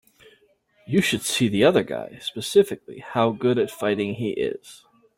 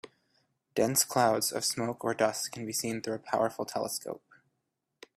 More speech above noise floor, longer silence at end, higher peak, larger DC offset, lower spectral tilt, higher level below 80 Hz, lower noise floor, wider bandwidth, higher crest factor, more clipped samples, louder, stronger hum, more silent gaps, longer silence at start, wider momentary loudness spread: second, 39 dB vs 52 dB; second, 0.4 s vs 1 s; first, -4 dBFS vs -10 dBFS; neither; first, -5 dB/octave vs -3 dB/octave; first, -60 dBFS vs -72 dBFS; second, -61 dBFS vs -82 dBFS; about the same, 16.5 kHz vs 16 kHz; about the same, 18 dB vs 22 dB; neither; first, -23 LUFS vs -30 LUFS; neither; neither; first, 0.9 s vs 0.05 s; about the same, 12 LU vs 10 LU